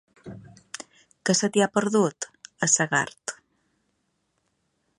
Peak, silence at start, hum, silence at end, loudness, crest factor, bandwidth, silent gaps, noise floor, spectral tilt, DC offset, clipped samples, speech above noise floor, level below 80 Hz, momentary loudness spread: -6 dBFS; 0.25 s; none; 1.65 s; -23 LUFS; 22 dB; 11.5 kHz; none; -74 dBFS; -3 dB/octave; under 0.1%; under 0.1%; 50 dB; -70 dBFS; 20 LU